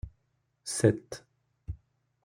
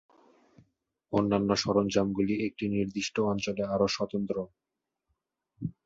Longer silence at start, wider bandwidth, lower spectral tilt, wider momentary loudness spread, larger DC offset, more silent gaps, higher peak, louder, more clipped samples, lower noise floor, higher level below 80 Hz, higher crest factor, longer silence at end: second, 0.05 s vs 1.1 s; first, 16 kHz vs 7.8 kHz; about the same, -5.5 dB/octave vs -5.5 dB/octave; first, 21 LU vs 8 LU; neither; neither; about the same, -8 dBFS vs -10 dBFS; about the same, -29 LUFS vs -29 LUFS; neither; second, -76 dBFS vs -83 dBFS; first, -52 dBFS vs -60 dBFS; first, 26 dB vs 20 dB; first, 0.5 s vs 0.15 s